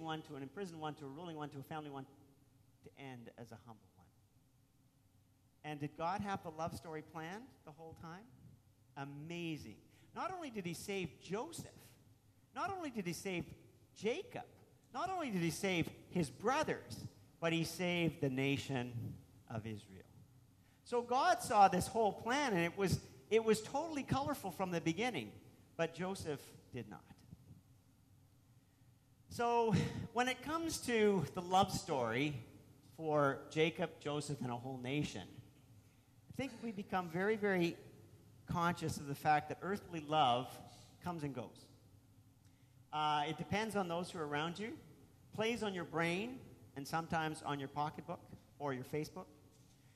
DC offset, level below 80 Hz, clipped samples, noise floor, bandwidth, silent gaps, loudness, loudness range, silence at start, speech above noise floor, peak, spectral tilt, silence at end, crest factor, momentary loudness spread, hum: under 0.1%; -70 dBFS; under 0.1%; -72 dBFS; 14 kHz; none; -39 LUFS; 13 LU; 0 s; 32 dB; -18 dBFS; -5 dB/octave; 0.35 s; 22 dB; 19 LU; none